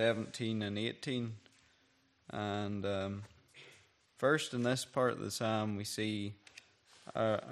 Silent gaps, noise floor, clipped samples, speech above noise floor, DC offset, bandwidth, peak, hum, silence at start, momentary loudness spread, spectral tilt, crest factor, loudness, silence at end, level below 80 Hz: none; -72 dBFS; under 0.1%; 36 dB; under 0.1%; 14 kHz; -18 dBFS; none; 0 s; 22 LU; -5 dB/octave; 20 dB; -37 LUFS; 0 s; -76 dBFS